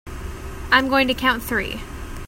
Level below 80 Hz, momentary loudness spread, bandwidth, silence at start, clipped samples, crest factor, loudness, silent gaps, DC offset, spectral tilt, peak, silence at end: -36 dBFS; 18 LU; 16.5 kHz; 0.05 s; under 0.1%; 22 dB; -19 LUFS; none; under 0.1%; -4 dB/octave; 0 dBFS; 0 s